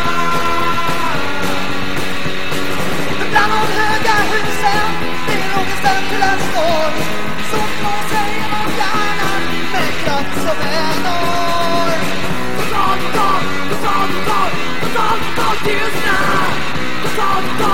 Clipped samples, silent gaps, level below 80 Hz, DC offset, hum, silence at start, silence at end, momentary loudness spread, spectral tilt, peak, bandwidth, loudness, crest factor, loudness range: under 0.1%; none; -38 dBFS; 20%; none; 0 s; 0 s; 5 LU; -4 dB/octave; -2 dBFS; 17.5 kHz; -17 LUFS; 18 dB; 2 LU